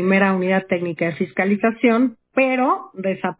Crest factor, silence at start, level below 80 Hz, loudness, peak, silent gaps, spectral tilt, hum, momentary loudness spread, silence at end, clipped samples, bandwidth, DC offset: 16 dB; 0 s; -64 dBFS; -19 LUFS; -4 dBFS; none; -10.5 dB/octave; none; 7 LU; 0.05 s; under 0.1%; 4 kHz; under 0.1%